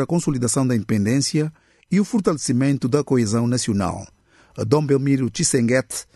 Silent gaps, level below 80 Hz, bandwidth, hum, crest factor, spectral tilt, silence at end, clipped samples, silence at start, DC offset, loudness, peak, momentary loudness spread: none; -52 dBFS; 12.5 kHz; none; 18 dB; -5.5 dB/octave; 0.1 s; under 0.1%; 0 s; under 0.1%; -20 LUFS; -2 dBFS; 5 LU